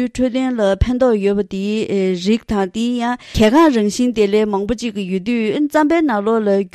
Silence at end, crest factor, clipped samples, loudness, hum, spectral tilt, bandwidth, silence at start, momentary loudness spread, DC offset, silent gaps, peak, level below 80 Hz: 0.05 s; 14 dB; under 0.1%; -16 LUFS; none; -6 dB/octave; 13.5 kHz; 0 s; 7 LU; under 0.1%; none; -2 dBFS; -34 dBFS